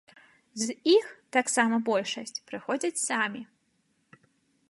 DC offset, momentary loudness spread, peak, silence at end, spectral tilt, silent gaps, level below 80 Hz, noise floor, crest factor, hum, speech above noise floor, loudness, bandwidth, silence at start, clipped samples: under 0.1%; 13 LU; -8 dBFS; 1.25 s; -2.5 dB/octave; none; -82 dBFS; -72 dBFS; 22 dB; none; 44 dB; -28 LUFS; 11.5 kHz; 0.55 s; under 0.1%